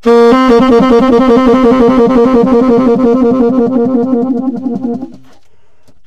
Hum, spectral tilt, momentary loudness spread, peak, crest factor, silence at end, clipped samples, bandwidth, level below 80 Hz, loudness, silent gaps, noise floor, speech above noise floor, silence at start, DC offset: none; -7.5 dB/octave; 10 LU; 0 dBFS; 8 dB; 0.9 s; under 0.1%; 8.2 kHz; -34 dBFS; -8 LUFS; none; -53 dBFS; 45 dB; 0.05 s; 1%